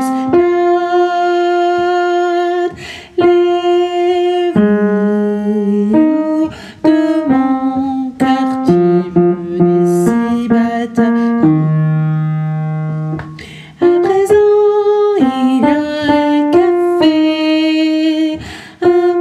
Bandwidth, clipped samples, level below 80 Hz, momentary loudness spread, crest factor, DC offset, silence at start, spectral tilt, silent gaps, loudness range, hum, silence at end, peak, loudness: 12 kHz; under 0.1%; -48 dBFS; 7 LU; 12 dB; under 0.1%; 0 s; -7.5 dB/octave; none; 2 LU; none; 0 s; 0 dBFS; -13 LUFS